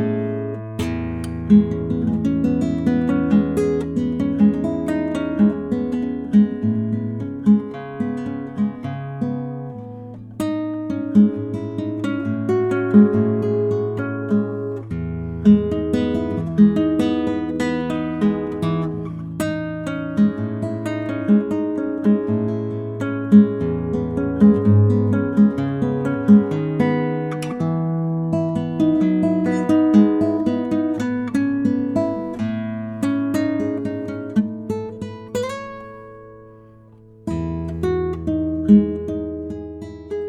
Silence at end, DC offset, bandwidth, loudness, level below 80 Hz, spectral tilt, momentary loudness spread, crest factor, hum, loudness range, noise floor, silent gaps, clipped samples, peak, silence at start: 0 s; under 0.1%; 10.5 kHz; -20 LUFS; -48 dBFS; -8.5 dB/octave; 12 LU; 18 dB; none; 7 LU; -46 dBFS; none; under 0.1%; -2 dBFS; 0 s